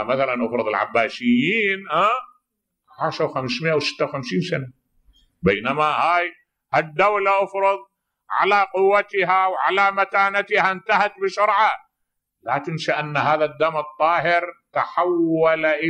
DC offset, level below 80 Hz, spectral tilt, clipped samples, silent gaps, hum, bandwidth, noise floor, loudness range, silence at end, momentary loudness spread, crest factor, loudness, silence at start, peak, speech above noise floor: under 0.1%; -60 dBFS; -5.5 dB/octave; under 0.1%; none; none; 9.6 kHz; -78 dBFS; 4 LU; 0 s; 8 LU; 16 dB; -20 LUFS; 0 s; -4 dBFS; 58 dB